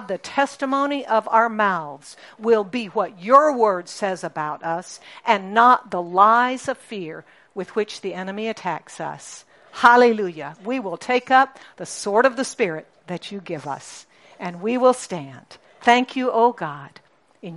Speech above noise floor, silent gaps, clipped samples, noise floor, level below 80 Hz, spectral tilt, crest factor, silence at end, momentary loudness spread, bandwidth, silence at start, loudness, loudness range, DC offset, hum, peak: 19 dB; none; under 0.1%; -40 dBFS; -70 dBFS; -4 dB/octave; 20 dB; 0 s; 19 LU; 11.5 kHz; 0 s; -20 LUFS; 6 LU; under 0.1%; none; 0 dBFS